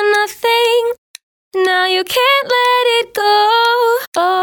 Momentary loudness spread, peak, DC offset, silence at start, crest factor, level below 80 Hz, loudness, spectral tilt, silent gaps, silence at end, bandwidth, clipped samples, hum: 5 LU; 0 dBFS; under 0.1%; 0 s; 14 dB; -64 dBFS; -13 LUFS; -0.5 dB/octave; 0.98-1.14 s, 1.23-1.51 s, 4.07-4.12 s; 0 s; 19 kHz; under 0.1%; none